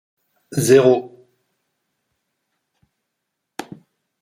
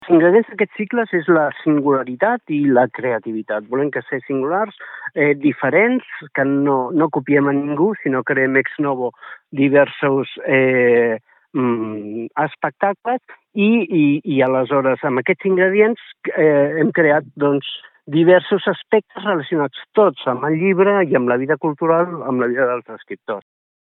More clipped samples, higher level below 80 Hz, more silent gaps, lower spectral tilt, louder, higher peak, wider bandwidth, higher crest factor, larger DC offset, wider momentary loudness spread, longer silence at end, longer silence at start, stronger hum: neither; first, -66 dBFS vs -72 dBFS; neither; second, -5.5 dB/octave vs -11 dB/octave; about the same, -16 LUFS vs -17 LUFS; about the same, -2 dBFS vs 0 dBFS; first, 15.5 kHz vs 4.1 kHz; about the same, 20 dB vs 16 dB; neither; first, 23 LU vs 11 LU; first, 0.6 s vs 0.4 s; first, 0.5 s vs 0 s; neither